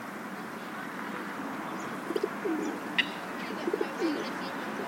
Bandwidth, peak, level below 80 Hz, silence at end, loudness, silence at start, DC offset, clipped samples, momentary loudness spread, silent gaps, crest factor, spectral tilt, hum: 16.5 kHz; -10 dBFS; -78 dBFS; 0 s; -34 LUFS; 0 s; under 0.1%; under 0.1%; 9 LU; none; 24 dB; -4 dB/octave; none